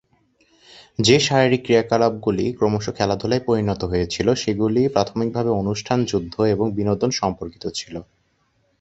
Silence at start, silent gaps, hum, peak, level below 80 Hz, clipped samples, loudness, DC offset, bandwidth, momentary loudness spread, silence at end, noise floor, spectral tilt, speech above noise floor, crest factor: 0.75 s; none; none; 0 dBFS; -46 dBFS; under 0.1%; -20 LUFS; under 0.1%; 8.2 kHz; 11 LU; 0.75 s; -65 dBFS; -5.5 dB/octave; 45 dB; 20 dB